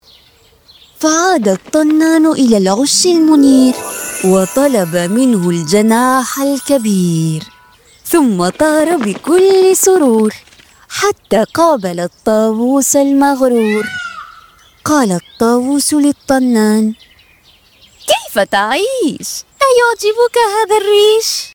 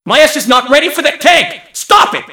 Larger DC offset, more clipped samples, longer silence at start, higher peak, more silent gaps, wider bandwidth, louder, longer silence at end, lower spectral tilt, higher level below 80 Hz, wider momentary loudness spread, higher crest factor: second, under 0.1% vs 0.3%; second, under 0.1% vs 3%; first, 1 s vs 0.05 s; about the same, 0 dBFS vs 0 dBFS; neither; about the same, over 20 kHz vs over 20 kHz; about the same, -11 LUFS vs -9 LUFS; about the same, 0.05 s vs 0 s; first, -4 dB/octave vs -1.5 dB/octave; about the same, -52 dBFS vs -48 dBFS; first, 8 LU vs 5 LU; about the same, 12 dB vs 10 dB